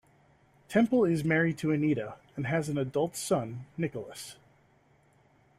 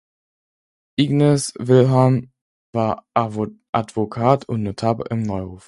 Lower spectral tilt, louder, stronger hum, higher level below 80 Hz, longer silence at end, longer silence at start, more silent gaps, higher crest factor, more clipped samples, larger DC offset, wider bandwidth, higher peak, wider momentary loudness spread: about the same, -6 dB/octave vs -7 dB/octave; second, -30 LUFS vs -20 LUFS; neither; second, -66 dBFS vs -50 dBFS; first, 1.25 s vs 0.1 s; second, 0.7 s vs 1 s; second, none vs 2.41-2.73 s, 3.69-3.73 s; about the same, 18 dB vs 20 dB; neither; neither; first, 15.5 kHz vs 11.5 kHz; second, -12 dBFS vs 0 dBFS; first, 14 LU vs 10 LU